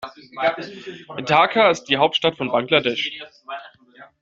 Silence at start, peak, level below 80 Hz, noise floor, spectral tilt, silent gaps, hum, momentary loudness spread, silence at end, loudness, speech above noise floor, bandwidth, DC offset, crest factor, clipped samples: 0 s; -2 dBFS; -64 dBFS; -48 dBFS; -4 dB/octave; none; none; 19 LU; 0.15 s; -19 LUFS; 28 dB; 7.8 kHz; under 0.1%; 20 dB; under 0.1%